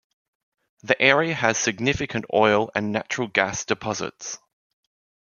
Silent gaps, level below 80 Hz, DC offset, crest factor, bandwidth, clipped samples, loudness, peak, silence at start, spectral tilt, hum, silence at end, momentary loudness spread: none; -56 dBFS; under 0.1%; 22 dB; 7.4 kHz; under 0.1%; -22 LUFS; -2 dBFS; 0.85 s; -3.5 dB/octave; none; 0.9 s; 12 LU